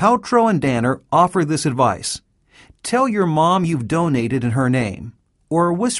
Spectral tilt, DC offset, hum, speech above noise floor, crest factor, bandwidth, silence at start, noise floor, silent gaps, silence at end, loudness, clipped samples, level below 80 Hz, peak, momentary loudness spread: -6 dB/octave; under 0.1%; none; 33 dB; 16 dB; 11.5 kHz; 0 s; -50 dBFS; none; 0 s; -18 LUFS; under 0.1%; -50 dBFS; -2 dBFS; 10 LU